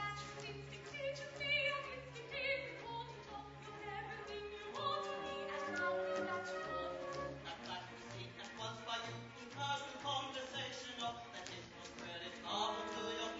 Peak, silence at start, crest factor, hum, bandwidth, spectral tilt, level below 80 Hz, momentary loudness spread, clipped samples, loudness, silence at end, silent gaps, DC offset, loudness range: -26 dBFS; 0 s; 18 dB; none; 7.6 kHz; -1.5 dB/octave; -68 dBFS; 10 LU; under 0.1%; -43 LUFS; 0 s; none; under 0.1%; 3 LU